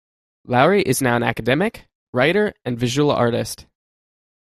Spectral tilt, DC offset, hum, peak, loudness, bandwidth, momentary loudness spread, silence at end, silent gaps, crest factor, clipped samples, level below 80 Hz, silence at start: -5 dB/octave; under 0.1%; none; -2 dBFS; -19 LUFS; 15 kHz; 9 LU; 0.85 s; 1.95-2.13 s; 20 dB; under 0.1%; -52 dBFS; 0.5 s